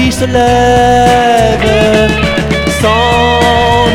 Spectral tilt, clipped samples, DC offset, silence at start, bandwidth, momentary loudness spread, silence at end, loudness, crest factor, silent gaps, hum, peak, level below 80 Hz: -5 dB/octave; 0.4%; under 0.1%; 0 s; 17 kHz; 4 LU; 0 s; -8 LUFS; 8 dB; none; none; 0 dBFS; -22 dBFS